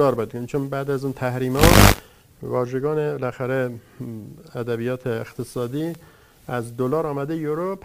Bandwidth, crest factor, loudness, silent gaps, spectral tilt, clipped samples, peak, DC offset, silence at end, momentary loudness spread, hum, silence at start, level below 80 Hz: 16 kHz; 22 dB; -22 LUFS; none; -5 dB/octave; under 0.1%; 0 dBFS; under 0.1%; 0.05 s; 19 LU; none; 0 s; -32 dBFS